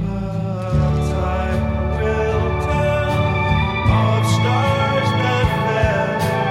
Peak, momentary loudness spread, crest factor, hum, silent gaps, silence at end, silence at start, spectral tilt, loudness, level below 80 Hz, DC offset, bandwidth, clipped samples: -4 dBFS; 4 LU; 14 dB; none; none; 0 s; 0 s; -6.5 dB/octave; -18 LUFS; -28 dBFS; under 0.1%; 14 kHz; under 0.1%